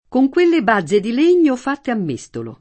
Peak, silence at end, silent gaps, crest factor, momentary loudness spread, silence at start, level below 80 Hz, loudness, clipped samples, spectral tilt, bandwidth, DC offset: -2 dBFS; 0.05 s; none; 14 dB; 11 LU; 0.1 s; -56 dBFS; -16 LUFS; under 0.1%; -6 dB/octave; 8.6 kHz; under 0.1%